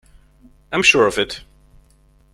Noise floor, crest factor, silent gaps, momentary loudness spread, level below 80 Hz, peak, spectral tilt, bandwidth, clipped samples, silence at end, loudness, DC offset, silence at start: -54 dBFS; 22 dB; none; 13 LU; -48 dBFS; 0 dBFS; -2.5 dB/octave; 15 kHz; under 0.1%; 0.95 s; -16 LUFS; under 0.1%; 0.7 s